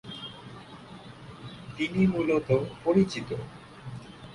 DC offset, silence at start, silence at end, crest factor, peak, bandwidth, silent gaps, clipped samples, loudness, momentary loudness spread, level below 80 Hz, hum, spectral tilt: under 0.1%; 0.05 s; 0 s; 20 dB; -10 dBFS; 11 kHz; none; under 0.1%; -27 LUFS; 21 LU; -56 dBFS; none; -7 dB/octave